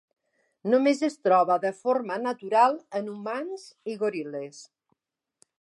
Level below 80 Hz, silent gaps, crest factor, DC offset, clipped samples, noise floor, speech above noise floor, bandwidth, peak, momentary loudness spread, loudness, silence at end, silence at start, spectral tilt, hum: -86 dBFS; none; 18 dB; under 0.1%; under 0.1%; -76 dBFS; 51 dB; 11.5 kHz; -8 dBFS; 15 LU; -26 LUFS; 0.95 s; 0.65 s; -5.5 dB/octave; none